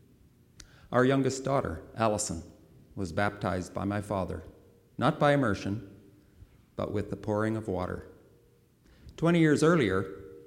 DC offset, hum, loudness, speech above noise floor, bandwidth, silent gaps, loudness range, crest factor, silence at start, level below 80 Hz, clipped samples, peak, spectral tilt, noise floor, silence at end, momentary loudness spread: under 0.1%; none; -29 LUFS; 34 dB; 16 kHz; none; 6 LU; 20 dB; 0.9 s; -56 dBFS; under 0.1%; -10 dBFS; -6 dB/octave; -63 dBFS; 0 s; 15 LU